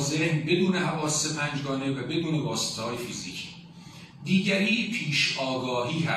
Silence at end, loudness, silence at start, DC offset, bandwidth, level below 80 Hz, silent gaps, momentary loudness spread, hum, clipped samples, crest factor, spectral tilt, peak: 0 s; -27 LUFS; 0 s; under 0.1%; 14 kHz; -62 dBFS; none; 14 LU; none; under 0.1%; 16 dB; -4 dB/octave; -12 dBFS